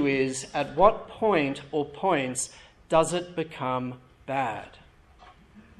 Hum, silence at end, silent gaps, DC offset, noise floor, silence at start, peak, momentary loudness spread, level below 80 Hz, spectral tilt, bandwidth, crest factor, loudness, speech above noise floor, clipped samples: none; 0.2 s; none; under 0.1%; -53 dBFS; 0 s; -6 dBFS; 11 LU; -54 dBFS; -4.5 dB/octave; 12.5 kHz; 22 dB; -27 LUFS; 27 dB; under 0.1%